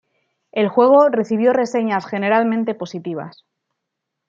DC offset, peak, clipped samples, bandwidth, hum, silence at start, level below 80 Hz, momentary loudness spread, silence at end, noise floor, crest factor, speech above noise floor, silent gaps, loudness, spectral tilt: under 0.1%; -2 dBFS; under 0.1%; 7.6 kHz; none; 0.55 s; -72 dBFS; 15 LU; 1 s; -79 dBFS; 16 dB; 62 dB; none; -17 LUFS; -6.5 dB/octave